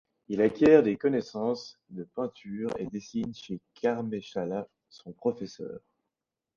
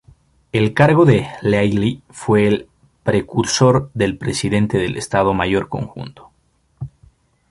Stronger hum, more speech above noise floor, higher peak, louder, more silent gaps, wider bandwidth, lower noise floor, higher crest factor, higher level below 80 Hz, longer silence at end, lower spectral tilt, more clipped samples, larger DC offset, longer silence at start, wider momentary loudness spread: neither; first, 59 dB vs 44 dB; second, -6 dBFS vs 0 dBFS; second, -29 LUFS vs -17 LUFS; neither; second, 7.2 kHz vs 11.5 kHz; first, -88 dBFS vs -61 dBFS; about the same, 22 dB vs 18 dB; second, -64 dBFS vs -44 dBFS; first, 0.8 s vs 0.65 s; about the same, -7 dB/octave vs -6 dB/octave; neither; neither; second, 0.3 s vs 0.55 s; first, 21 LU vs 16 LU